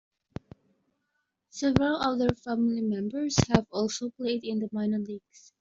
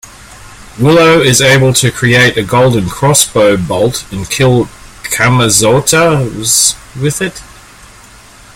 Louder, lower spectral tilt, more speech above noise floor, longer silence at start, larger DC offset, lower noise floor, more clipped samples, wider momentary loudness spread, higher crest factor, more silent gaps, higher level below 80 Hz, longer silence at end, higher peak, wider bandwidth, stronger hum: second, -28 LUFS vs -9 LUFS; first, -5.5 dB/octave vs -3.5 dB/octave; first, 51 dB vs 28 dB; first, 1.55 s vs 0.05 s; neither; first, -79 dBFS vs -37 dBFS; second, under 0.1% vs 0.1%; first, 19 LU vs 11 LU; first, 26 dB vs 10 dB; neither; second, -54 dBFS vs -36 dBFS; second, 0.45 s vs 1.1 s; second, -4 dBFS vs 0 dBFS; second, 7.8 kHz vs over 20 kHz; neither